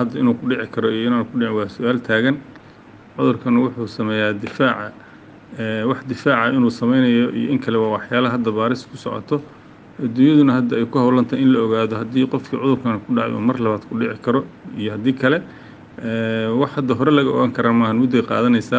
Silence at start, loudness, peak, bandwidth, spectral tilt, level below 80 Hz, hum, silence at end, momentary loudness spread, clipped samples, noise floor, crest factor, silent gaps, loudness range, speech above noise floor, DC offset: 0 s; -19 LUFS; -2 dBFS; 7.6 kHz; -7.5 dB/octave; -58 dBFS; none; 0 s; 9 LU; under 0.1%; -43 dBFS; 16 dB; none; 4 LU; 25 dB; under 0.1%